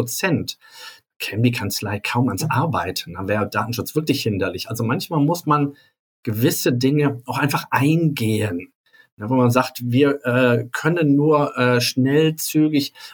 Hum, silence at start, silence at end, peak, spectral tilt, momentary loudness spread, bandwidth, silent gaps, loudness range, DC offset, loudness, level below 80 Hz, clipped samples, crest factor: none; 0 s; 0 s; -4 dBFS; -5.5 dB/octave; 9 LU; over 20 kHz; 1.16-1.20 s, 5.99-6.23 s, 8.75-8.84 s, 9.12-9.17 s; 4 LU; under 0.1%; -20 LUFS; -60 dBFS; under 0.1%; 16 dB